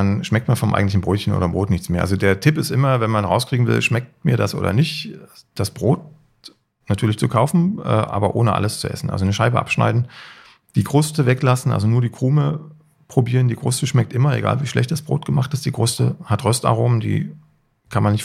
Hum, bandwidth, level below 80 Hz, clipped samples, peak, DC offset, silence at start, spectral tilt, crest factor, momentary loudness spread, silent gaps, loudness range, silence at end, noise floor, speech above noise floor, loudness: none; 15 kHz; -48 dBFS; under 0.1%; -2 dBFS; under 0.1%; 0 s; -6 dB/octave; 16 dB; 6 LU; none; 3 LU; 0 s; -47 dBFS; 29 dB; -19 LUFS